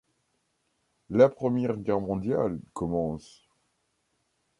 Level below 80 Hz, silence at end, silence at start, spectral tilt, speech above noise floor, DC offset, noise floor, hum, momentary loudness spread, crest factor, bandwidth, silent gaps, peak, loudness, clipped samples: -56 dBFS; 1.4 s; 1.1 s; -8.5 dB/octave; 49 dB; under 0.1%; -75 dBFS; none; 11 LU; 22 dB; 11 kHz; none; -8 dBFS; -27 LUFS; under 0.1%